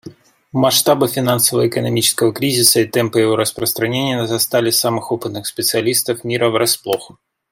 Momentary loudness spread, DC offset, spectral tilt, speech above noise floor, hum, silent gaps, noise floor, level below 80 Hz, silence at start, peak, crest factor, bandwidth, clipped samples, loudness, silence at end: 8 LU; under 0.1%; -3.5 dB/octave; 23 dB; none; none; -39 dBFS; -58 dBFS; 0.05 s; 0 dBFS; 16 dB; 16.5 kHz; under 0.1%; -15 LUFS; 0.45 s